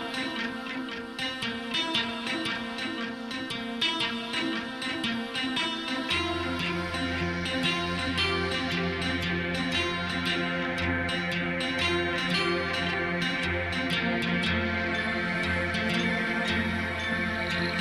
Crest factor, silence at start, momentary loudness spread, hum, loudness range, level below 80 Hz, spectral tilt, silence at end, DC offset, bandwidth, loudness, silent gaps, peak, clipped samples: 16 dB; 0 s; 6 LU; none; 3 LU; -50 dBFS; -4.5 dB/octave; 0 s; under 0.1%; 13 kHz; -28 LUFS; none; -14 dBFS; under 0.1%